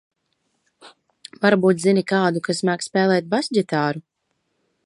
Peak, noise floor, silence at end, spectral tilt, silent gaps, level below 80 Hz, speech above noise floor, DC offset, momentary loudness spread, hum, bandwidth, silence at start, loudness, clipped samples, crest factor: -2 dBFS; -73 dBFS; 0.85 s; -5.5 dB/octave; none; -70 dBFS; 53 dB; under 0.1%; 5 LU; none; 11.5 kHz; 0.85 s; -20 LUFS; under 0.1%; 20 dB